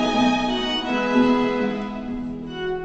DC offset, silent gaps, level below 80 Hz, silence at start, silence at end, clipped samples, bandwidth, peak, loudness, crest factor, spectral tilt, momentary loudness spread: under 0.1%; none; -44 dBFS; 0 s; 0 s; under 0.1%; 8 kHz; -8 dBFS; -22 LUFS; 14 dB; -5 dB/octave; 11 LU